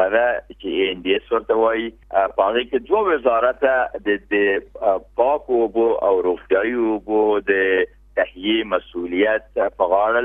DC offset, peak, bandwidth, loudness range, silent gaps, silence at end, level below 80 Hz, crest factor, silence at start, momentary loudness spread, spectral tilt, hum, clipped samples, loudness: under 0.1%; -4 dBFS; 3.8 kHz; 1 LU; none; 0 s; -50 dBFS; 16 dB; 0 s; 6 LU; -7.5 dB/octave; none; under 0.1%; -20 LUFS